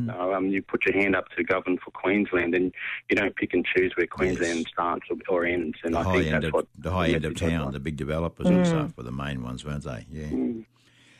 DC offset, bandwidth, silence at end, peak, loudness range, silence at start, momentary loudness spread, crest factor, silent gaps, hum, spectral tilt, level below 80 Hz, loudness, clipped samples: under 0.1%; 13 kHz; 0.55 s; -12 dBFS; 3 LU; 0 s; 9 LU; 14 dB; none; none; -6.5 dB/octave; -46 dBFS; -26 LUFS; under 0.1%